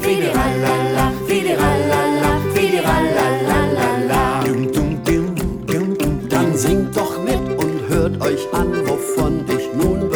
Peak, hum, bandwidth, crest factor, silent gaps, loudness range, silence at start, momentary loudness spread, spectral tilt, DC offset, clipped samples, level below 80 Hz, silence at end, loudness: -4 dBFS; none; over 20 kHz; 14 dB; none; 2 LU; 0 s; 4 LU; -5.5 dB/octave; under 0.1%; under 0.1%; -30 dBFS; 0 s; -18 LUFS